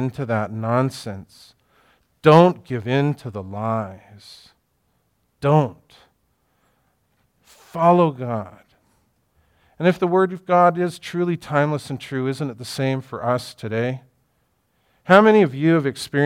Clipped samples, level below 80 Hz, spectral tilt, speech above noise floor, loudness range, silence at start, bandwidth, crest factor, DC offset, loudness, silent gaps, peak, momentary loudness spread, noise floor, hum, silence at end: under 0.1%; -64 dBFS; -7 dB/octave; 48 dB; 7 LU; 0 s; 15 kHz; 20 dB; under 0.1%; -20 LUFS; none; 0 dBFS; 15 LU; -68 dBFS; none; 0 s